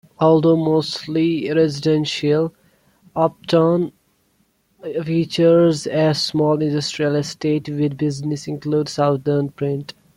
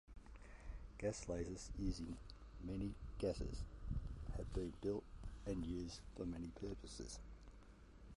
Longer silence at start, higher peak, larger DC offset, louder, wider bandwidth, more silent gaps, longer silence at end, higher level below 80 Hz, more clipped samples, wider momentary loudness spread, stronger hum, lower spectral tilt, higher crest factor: about the same, 0.2 s vs 0.1 s; first, -2 dBFS vs -30 dBFS; neither; first, -19 LUFS vs -48 LUFS; about the same, 12.5 kHz vs 11.5 kHz; neither; first, 0.25 s vs 0 s; second, -58 dBFS vs -52 dBFS; neither; second, 10 LU vs 16 LU; neither; about the same, -6.5 dB/octave vs -6 dB/octave; about the same, 16 dB vs 18 dB